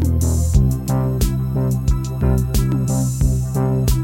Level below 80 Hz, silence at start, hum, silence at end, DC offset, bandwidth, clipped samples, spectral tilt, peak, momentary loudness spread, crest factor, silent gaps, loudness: -22 dBFS; 0 s; none; 0 s; under 0.1%; 17 kHz; under 0.1%; -7 dB/octave; -2 dBFS; 3 LU; 16 dB; none; -19 LUFS